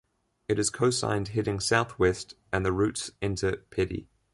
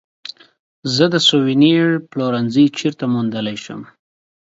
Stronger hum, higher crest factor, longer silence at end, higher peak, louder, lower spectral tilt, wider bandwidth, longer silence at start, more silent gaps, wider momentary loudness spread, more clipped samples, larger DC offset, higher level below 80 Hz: neither; about the same, 18 dB vs 16 dB; second, 0.3 s vs 0.65 s; second, -10 dBFS vs 0 dBFS; second, -28 LUFS vs -16 LUFS; about the same, -4.5 dB/octave vs -5 dB/octave; first, 11.5 kHz vs 8 kHz; first, 0.5 s vs 0.25 s; second, none vs 0.59-0.83 s; second, 7 LU vs 20 LU; neither; neither; first, -48 dBFS vs -62 dBFS